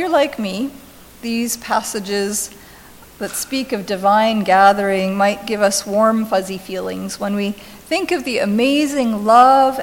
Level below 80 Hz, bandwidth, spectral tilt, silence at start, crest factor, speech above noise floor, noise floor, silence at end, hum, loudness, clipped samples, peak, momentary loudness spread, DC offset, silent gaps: -52 dBFS; 17 kHz; -4 dB/octave; 0 s; 16 dB; 25 dB; -42 dBFS; 0 s; none; -17 LUFS; under 0.1%; 0 dBFS; 13 LU; under 0.1%; none